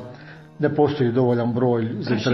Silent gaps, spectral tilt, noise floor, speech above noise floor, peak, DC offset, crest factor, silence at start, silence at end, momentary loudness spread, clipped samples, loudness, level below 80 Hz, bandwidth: none; -8 dB/octave; -42 dBFS; 22 dB; -6 dBFS; under 0.1%; 16 dB; 0 s; 0 s; 9 LU; under 0.1%; -21 LUFS; -60 dBFS; 6 kHz